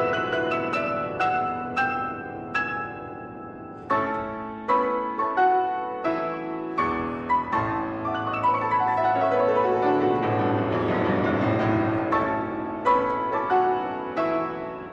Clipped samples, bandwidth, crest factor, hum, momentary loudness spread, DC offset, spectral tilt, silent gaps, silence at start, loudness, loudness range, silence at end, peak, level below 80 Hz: under 0.1%; 8.4 kHz; 14 dB; none; 9 LU; under 0.1%; -7.5 dB/octave; none; 0 s; -25 LUFS; 5 LU; 0 s; -10 dBFS; -54 dBFS